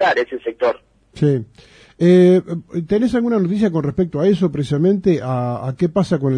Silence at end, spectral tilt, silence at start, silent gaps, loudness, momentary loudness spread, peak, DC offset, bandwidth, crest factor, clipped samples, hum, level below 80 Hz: 0 s; -8 dB/octave; 0 s; none; -17 LUFS; 9 LU; -2 dBFS; under 0.1%; 10 kHz; 14 dB; under 0.1%; none; -48 dBFS